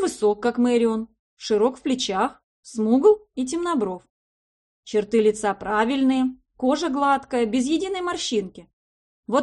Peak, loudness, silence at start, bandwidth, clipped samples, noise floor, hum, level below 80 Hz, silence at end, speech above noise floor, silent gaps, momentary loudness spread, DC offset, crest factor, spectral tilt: -6 dBFS; -22 LUFS; 0 s; 11.5 kHz; under 0.1%; under -90 dBFS; none; -58 dBFS; 0 s; over 68 dB; 1.19-1.37 s, 2.44-2.63 s, 4.10-4.83 s, 8.73-9.23 s; 8 LU; under 0.1%; 18 dB; -4.5 dB/octave